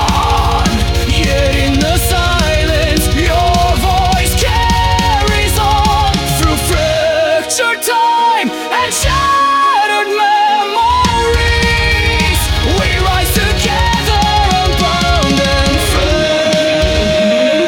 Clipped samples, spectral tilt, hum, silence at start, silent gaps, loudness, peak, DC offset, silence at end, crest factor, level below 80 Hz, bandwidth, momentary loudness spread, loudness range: under 0.1%; -4 dB/octave; none; 0 s; none; -12 LUFS; 0 dBFS; under 0.1%; 0 s; 12 dB; -18 dBFS; 18 kHz; 2 LU; 1 LU